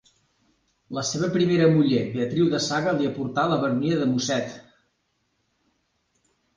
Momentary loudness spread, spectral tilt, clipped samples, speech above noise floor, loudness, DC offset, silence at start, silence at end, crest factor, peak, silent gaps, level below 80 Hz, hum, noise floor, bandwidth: 9 LU; -5.5 dB/octave; under 0.1%; 50 dB; -23 LUFS; under 0.1%; 0.9 s; 1.95 s; 18 dB; -8 dBFS; none; -60 dBFS; none; -73 dBFS; 10 kHz